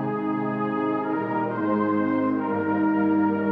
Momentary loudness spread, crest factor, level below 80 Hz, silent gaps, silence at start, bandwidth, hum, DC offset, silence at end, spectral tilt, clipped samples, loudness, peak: 4 LU; 12 dB; -72 dBFS; none; 0 s; 4.4 kHz; none; under 0.1%; 0 s; -10 dB/octave; under 0.1%; -24 LUFS; -12 dBFS